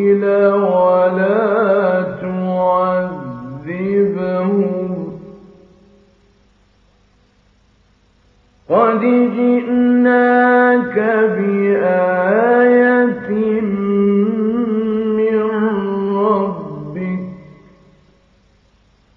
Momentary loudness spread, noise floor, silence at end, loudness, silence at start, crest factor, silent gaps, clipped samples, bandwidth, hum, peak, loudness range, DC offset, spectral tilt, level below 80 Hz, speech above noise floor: 12 LU; -54 dBFS; 1.75 s; -15 LUFS; 0 s; 14 dB; none; under 0.1%; 4.6 kHz; none; -2 dBFS; 9 LU; under 0.1%; -10 dB/octave; -56 dBFS; 42 dB